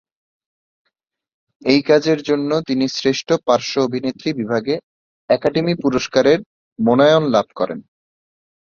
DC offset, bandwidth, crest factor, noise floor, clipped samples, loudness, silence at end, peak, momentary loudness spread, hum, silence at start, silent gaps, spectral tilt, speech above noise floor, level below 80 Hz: under 0.1%; 7.2 kHz; 18 dB; -74 dBFS; under 0.1%; -18 LUFS; 0.85 s; -2 dBFS; 10 LU; none; 1.65 s; 4.83-5.28 s, 6.46-6.76 s; -5.5 dB/octave; 58 dB; -56 dBFS